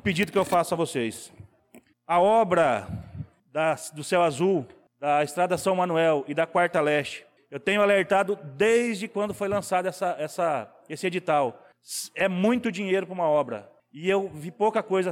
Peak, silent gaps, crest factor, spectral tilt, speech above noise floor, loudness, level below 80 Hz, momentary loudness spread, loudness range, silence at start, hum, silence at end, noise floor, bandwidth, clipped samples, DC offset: -12 dBFS; none; 14 dB; -5 dB/octave; 31 dB; -25 LUFS; -62 dBFS; 12 LU; 3 LU; 0.05 s; none; 0 s; -56 dBFS; 17.5 kHz; under 0.1%; under 0.1%